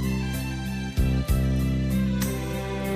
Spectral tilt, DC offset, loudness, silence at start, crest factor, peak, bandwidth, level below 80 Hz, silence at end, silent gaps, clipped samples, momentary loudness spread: -6.5 dB/octave; under 0.1%; -26 LUFS; 0 s; 14 dB; -12 dBFS; 15.5 kHz; -30 dBFS; 0 s; none; under 0.1%; 6 LU